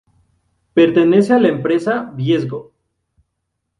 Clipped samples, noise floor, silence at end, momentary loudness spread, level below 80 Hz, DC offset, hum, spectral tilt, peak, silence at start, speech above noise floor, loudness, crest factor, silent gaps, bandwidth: under 0.1%; -74 dBFS; 1.2 s; 9 LU; -58 dBFS; under 0.1%; none; -7.5 dB/octave; 0 dBFS; 0.75 s; 60 dB; -15 LUFS; 16 dB; none; 10.5 kHz